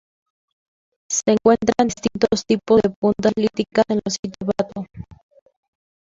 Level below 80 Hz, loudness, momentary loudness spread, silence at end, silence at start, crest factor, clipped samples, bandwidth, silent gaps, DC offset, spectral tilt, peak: -52 dBFS; -19 LUFS; 10 LU; 0.95 s; 1.1 s; 20 dB; under 0.1%; 7.8 kHz; 2.96-3.02 s, 4.19-4.23 s; under 0.1%; -4.5 dB/octave; -2 dBFS